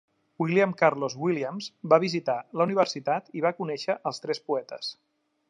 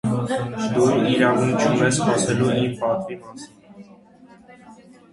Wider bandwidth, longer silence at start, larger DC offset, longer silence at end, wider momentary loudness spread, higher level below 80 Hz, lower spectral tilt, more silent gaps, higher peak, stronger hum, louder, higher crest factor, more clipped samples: about the same, 10.5 kHz vs 11.5 kHz; first, 0.4 s vs 0.05 s; neither; first, 0.55 s vs 0.4 s; second, 10 LU vs 17 LU; second, -80 dBFS vs -54 dBFS; about the same, -5.5 dB/octave vs -5.5 dB/octave; neither; about the same, -6 dBFS vs -4 dBFS; neither; second, -27 LUFS vs -20 LUFS; about the same, 22 dB vs 18 dB; neither